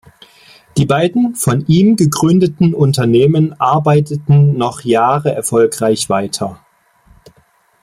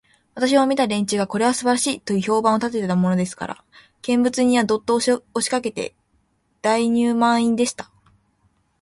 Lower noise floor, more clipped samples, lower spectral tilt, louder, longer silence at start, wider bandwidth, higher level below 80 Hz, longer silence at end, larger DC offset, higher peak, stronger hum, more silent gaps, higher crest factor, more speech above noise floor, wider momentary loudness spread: second, -54 dBFS vs -65 dBFS; neither; first, -6.5 dB/octave vs -4.5 dB/octave; first, -13 LUFS vs -20 LUFS; first, 0.75 s vs 0.35 s; first, 16 kHz vs 11.5 kHz; first, -48 dBFS vs -60 dBFS; first, 1.3 s vs 1 s; neither; about the same, -2 dBFS vs -4 dBFS; neither; neither; second, 12 dB vs 18 dB; second, 42 dB vs 46 dB; second, 6 LU vs 14 LU